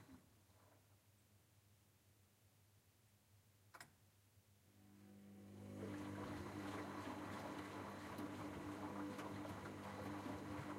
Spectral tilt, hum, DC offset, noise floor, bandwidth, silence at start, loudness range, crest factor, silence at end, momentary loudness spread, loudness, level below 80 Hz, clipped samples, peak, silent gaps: -5.5 dB/octave; none; under 0.1%; -75 dBFS; 16 kHz; 0 s; 19 LU; 16 dB; 0 s; 14 LU; -51 LUFS; -76 dBFS; under 0.1%; -38 dBFS; none